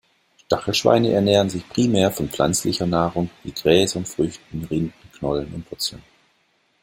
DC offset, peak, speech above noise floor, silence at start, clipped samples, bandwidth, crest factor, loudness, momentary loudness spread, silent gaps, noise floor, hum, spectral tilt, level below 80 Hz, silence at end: under 0.1%; -2 dBFS; 44 dB; 0.5 s; under 0.1%; 16.5 kHz; 20 dB; -21 LUFS; 10 LU; none; -64 dBFS; none; -5 dB/octave; -48 dBFS; 0.85 s